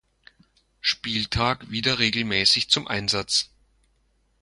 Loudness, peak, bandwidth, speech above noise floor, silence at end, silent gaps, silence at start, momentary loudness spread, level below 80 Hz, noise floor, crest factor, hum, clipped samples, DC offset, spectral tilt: -22 LUFS; -4 dBFS; 11.5 kHz; 43 dB; 0.95 s; none; 0.85 s; 7 LU; -48 dBFS; -67 dBFS; 22 dB; none; under 0.1%; under 0.1%; -2.5 dB/octave